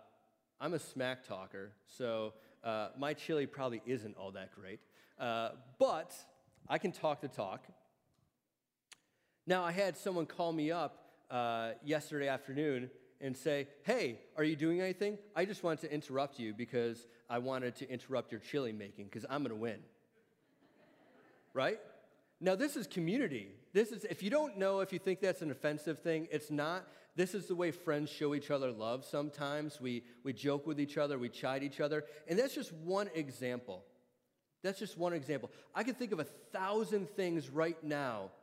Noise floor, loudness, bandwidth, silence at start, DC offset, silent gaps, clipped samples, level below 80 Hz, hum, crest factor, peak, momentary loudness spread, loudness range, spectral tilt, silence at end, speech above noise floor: -89 dBFS; -39 LUFS; 16 kHz; 0.6 s; under 0.1%; none; under 0.1%; -88 dBFS; none; 20 dB; -18 dBFS; 10 LU; 5 LU; -5.5 dB/octave; 0.05 s; 51 dB